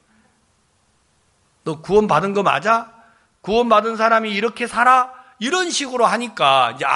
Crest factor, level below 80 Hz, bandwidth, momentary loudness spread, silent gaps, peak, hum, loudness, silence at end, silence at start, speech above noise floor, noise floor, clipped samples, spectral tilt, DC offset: 18 dB; -54 dBFS; 11.5 kHz; 12 LU; none; 0 dBFS; none; -17 LUFS; 0 s; 1.65 s; 44 dB; -61 dBFS; under 0.1%; -3.5 dB/octave; under 0.1%